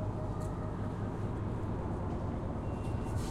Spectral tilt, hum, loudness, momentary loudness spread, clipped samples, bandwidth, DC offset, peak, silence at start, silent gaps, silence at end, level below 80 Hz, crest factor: -8 dB/octave; none; -38 LUFS; 1 LU; under 0.1%; 12.5 kHz; under 0.1%; -24 dBFS; 0 s; none; 0 s; -44 dBFS; 12 dB